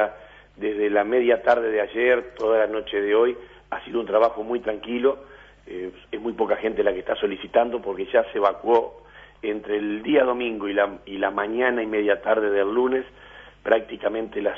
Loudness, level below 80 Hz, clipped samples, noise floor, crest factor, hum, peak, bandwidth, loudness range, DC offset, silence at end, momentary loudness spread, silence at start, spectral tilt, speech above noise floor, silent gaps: -23 LUFS; -56 dBFS; under 0.1%; -43 dBFS; 20 dB; 50 Hz at -55 dBFS; -4 dBFS; 6 kHz; 4 LU; under 0.1%; 0 s; 11 LU; 0 s; -6.5 dB/octave; 20 dB; none